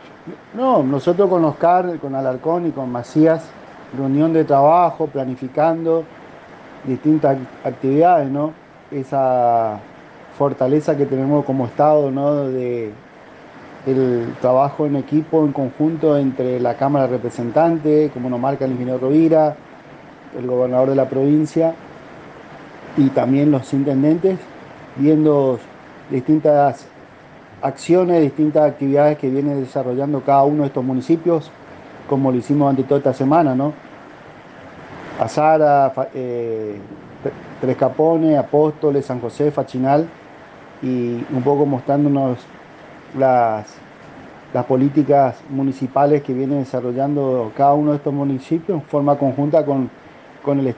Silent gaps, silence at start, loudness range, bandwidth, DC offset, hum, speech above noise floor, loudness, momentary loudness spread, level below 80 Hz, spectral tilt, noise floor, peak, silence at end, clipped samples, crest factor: none; 0.05 s; 2 LU; 8.8 kHz; under 0.1%; none; 25 dB; -17 LUFS; 14 LU; -60 dBFS; -9 dB/octave; -42 dBFS; -4 dBFS; 0.05 s; under 0.1%; 14 dB